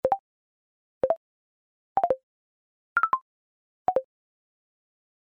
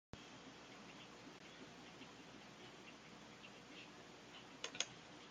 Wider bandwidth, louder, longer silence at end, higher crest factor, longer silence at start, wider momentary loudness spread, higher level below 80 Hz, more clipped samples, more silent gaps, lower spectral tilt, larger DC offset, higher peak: second, 6 kHz vs 15 kHz; first, -29 LUFS vs -54 LUFS; first, 1.25 s vs 0 s; second, 20 dB vs 36 dB; about the same, 0.05 s vs 0.15 s; second, 6 LU vs 12 LU; first, -66 dBFS vs -80 dBFS; neither; first, 0.20-1.01 s, 1.17-1.95 s, 2.23-2.96 s, 3.22-3.85 s vs none; first, -7 dB/octave vs -2 dB/octave; neither; first, -10 dBFS vs -20 dBFS